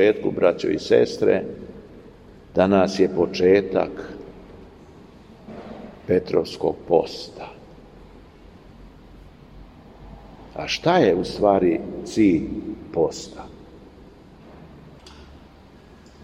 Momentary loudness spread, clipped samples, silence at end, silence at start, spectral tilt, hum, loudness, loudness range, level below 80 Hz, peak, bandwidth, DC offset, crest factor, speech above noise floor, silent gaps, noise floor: 22 LU; under 0.1%; 1 s; 0 s; -6 dB/octave; none; -21 LUFS; 11 LU; -50 dBFS; -2 dBFS; 11 kHz; under 0.1%; 20 dB; 27 dB; none; -47 dBFS